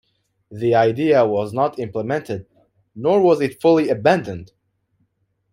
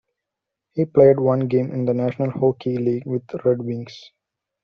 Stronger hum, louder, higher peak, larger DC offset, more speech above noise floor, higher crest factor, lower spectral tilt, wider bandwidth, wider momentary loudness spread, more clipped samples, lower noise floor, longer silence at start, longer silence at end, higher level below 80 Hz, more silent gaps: neither; about the same, -18 LUFS vs -20 LUFS; about the same, -2 dBFS vs -2 dBFS; neither; second, 51 dB vs 64 dB; about the same, 18 dB vs 18 dB; about the same, -7.5 dB/octave vs -8.5 dB/octave; first, 14 kHz vs 6.4 kHz; about the same, 12 LU vs 14 LU; neither; second, -68 dBFS vs -84 dBFS; second, 0.5 s vs 0.75 s; first, 1.1 s vs 0.65 s; about the same, -60 dBFS vs -60 dBFS; neither